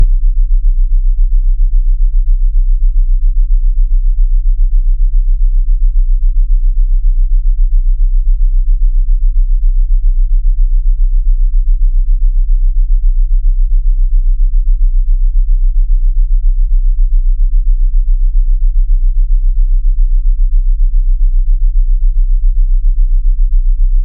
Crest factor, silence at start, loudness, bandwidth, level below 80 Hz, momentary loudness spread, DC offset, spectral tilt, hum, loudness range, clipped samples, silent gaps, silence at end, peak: 8 dB; 0 s; -16 LUFS; 0.1 kHz; -8 dBFS; 0 LU; under 0.1%; -15 dB/octave; none; 0 LU; under 0.1%; none; 0 s; 0 dBFS